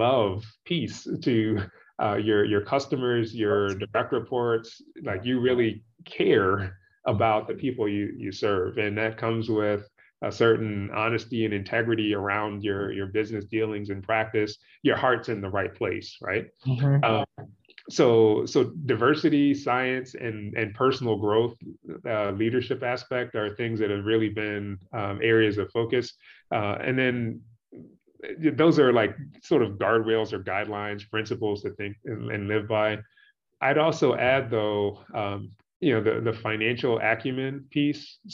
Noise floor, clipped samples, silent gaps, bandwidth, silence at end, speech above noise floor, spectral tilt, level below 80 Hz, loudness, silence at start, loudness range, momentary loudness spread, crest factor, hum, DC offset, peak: -49 dBFS; under 0.1%; 35.76-35.80 s; 7.6 kHz; 0 s; 24 dB; -6.5 dB/octave; -66 dBFS; -26 LUFS; 0 s; 4 LU; 11 LU; 18 dB; none; under 0.1%; -8 dBFS